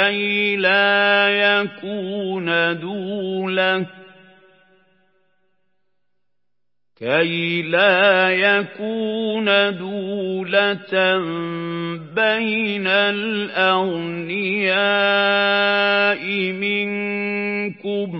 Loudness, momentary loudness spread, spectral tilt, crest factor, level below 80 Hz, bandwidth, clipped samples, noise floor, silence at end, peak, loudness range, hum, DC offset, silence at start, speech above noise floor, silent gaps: -18 LUFS; 11 LU; -9.5 dB/octave; 18 dB; -78 dBFS; 5.8 kHz; under 0.1%; -83 dBFS; 0 s; -2 dBFS; 8 LU; none; under 0.1%; 0 s; 63 dB; none